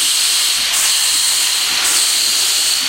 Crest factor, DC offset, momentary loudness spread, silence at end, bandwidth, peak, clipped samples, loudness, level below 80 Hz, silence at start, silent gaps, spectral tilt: 14 dB; under 0.1%; 1 LU; 0 s; 16 kHz; -2 dBFS; under 0.1%; -11 LUFS; -54 dBFS; 0 s; none; 3.5 dB/octave